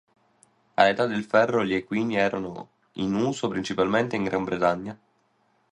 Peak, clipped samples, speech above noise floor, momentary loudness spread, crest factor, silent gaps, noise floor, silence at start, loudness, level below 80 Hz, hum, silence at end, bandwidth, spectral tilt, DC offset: -4 dBFS; under 0.1%; 43 dB; 12 LU; 22 dB; none; -67 dBFS; 0.8 s; -25 LUFS; -60 dBFS; none; 0.75 s; 10.5 kHz; -5.5 dB/octave; under 0.1%